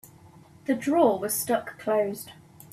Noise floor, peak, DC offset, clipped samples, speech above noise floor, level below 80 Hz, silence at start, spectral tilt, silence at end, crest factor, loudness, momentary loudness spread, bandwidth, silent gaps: -52 dBFS; -8 dBFS; under 0.1%; under 0.1%; 27 dB; -68 dBFS; 0.7 s; -4 dB/octave; 0.4 s; 20 dB; -26 LUFS; 16 LU; 16 kHz; none